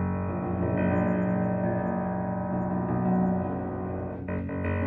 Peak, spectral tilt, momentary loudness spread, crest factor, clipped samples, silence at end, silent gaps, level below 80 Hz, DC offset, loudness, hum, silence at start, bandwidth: -14 dBFS; -12 dB/octave; 7 LU; 14 dB; under 0.1%; 0 s; none; -52 dBFS; under 0.1%; -28 LUFS; none; 0 s; 3.3 kHz